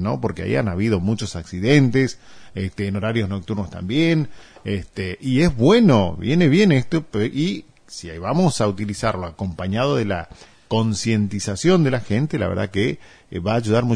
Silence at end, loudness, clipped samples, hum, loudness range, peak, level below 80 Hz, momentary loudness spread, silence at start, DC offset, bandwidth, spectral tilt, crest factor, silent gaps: 0 s; -20 LUFS; under 0.1%; none; 5 LU; -2 dBFS; -44 dBFS; 13 LU; 0 s; under 0.1%; 10.5 kHz; -6.5 dB/octave; 18 dB; none